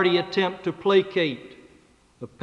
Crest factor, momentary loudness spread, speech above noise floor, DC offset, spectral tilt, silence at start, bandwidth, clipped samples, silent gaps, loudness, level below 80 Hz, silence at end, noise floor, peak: 18 dB; 20 LU; 34 dB; under 0.1%; -6.5 dB/octave; 0 s; 7.6 kHz; under 0.1%; none; -23 LUFS; -66 dBFS; 0.15 s; -57 dBFS; -8 dBFS